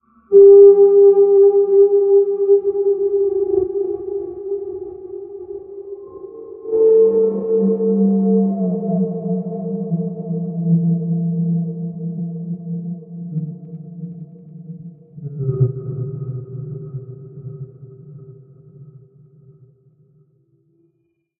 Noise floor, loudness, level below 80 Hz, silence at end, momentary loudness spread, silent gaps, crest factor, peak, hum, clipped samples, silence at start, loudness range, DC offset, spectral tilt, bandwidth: -67 dBFS; -16 LUFS; -60 dBFS; 2.5 s; 23 LU; none; 16 dB; 0 dBFS; none; under 0.1%; 0.3 s; 16 LU; under 0.1%; -15.5 dB/octave; 1.4 kHz